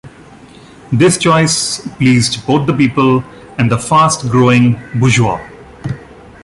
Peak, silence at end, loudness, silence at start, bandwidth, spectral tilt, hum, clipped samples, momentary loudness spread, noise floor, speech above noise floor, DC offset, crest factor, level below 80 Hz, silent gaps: 0 dBFS; 0.4 s; -12 LUFS; 0.05 s; 11.5 kHz; -5 dB/octave; none; under 0.1%; 15 LU; -38 dBFS; 26 dB; under 0.1%; 12 dB; -42 dBFS; none